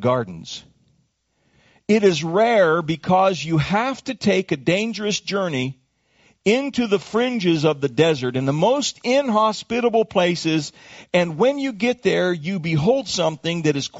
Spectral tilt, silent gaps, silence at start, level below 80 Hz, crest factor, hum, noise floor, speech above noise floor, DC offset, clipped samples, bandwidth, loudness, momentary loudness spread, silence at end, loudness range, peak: -4.5 dB/octave; none; 0 s; -56 dBFS; 18 dB; none; -67 dBFS; 47 dB; under 0.1%; under 0.1%; 8 kHz; -20 LUFS; 7 LU; 0 s; 3 LU; -4 dBFS